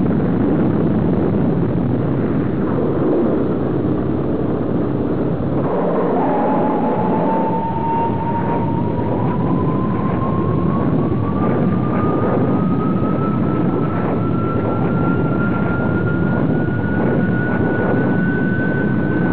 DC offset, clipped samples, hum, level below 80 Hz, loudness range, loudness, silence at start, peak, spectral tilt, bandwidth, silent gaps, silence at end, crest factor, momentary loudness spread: 4%; under 0.1%; none; -36 dBFS; 1 LU; -18 LUFS; 0 s; -4 dBFS; -13 dB/octave; 4 kHz; none; 0 s; 12 dB; 3 LU